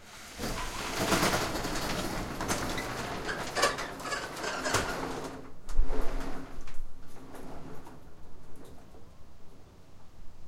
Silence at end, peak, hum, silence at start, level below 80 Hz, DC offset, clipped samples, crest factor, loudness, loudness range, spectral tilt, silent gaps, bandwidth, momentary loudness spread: 0 s; -10 dBFS; none; 0 s; -40 dBFS; under 0.1%; under 0.1%; 20 dB; -33 LUFS; 19 LU; -3 dB/octave; none; 16.5 kHz; 23 LU